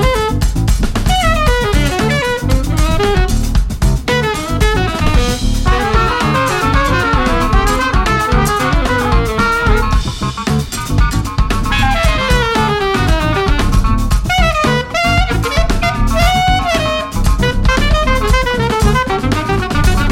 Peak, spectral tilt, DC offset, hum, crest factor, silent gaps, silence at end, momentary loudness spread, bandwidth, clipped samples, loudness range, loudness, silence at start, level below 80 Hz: 0 dBFS; -5 dB/octave; under 0.1%; none; 12 dB; none; 0 s; 3 LU; 16.5 kHz; under 0.1%; 2 LU; -14 LUFS; 0 s; -16 dBFS